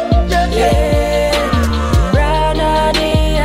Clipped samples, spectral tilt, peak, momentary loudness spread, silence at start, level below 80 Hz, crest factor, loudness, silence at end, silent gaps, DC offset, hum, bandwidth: under 0.1%; -5.5 dB/octave; -2 dBFS; 2 LU; 0 s; -18 dBFS; 10 dB; -14 LUFS; 0 s; none; under 0.1%; none; 15.5 kHz